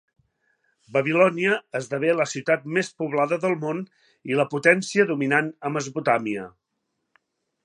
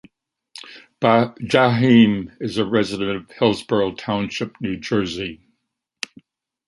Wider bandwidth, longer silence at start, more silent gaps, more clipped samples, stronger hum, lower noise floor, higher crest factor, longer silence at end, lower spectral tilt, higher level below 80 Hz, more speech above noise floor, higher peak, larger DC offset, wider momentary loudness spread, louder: about the same, 11 kHz vs 11.5 kHz; first, 0.9 s vs 0.55 s; neither; neither; neither; about the same, -78 dBFS vs -75 dBFS; about the same, 22 dB vs 20 dB; second, 1.15 s vs 1.35 s; about the same, -5 dB/octave vs -6 dB/octave; second, -74 dBFS vs -54 dBFS; about the same, 55 dB vs 57 dB; about the same, -2 dBFS vs -2 dBFS; neither; second, 11 LU vs 19 LU; second, -23 LUFS vs -19 LUFS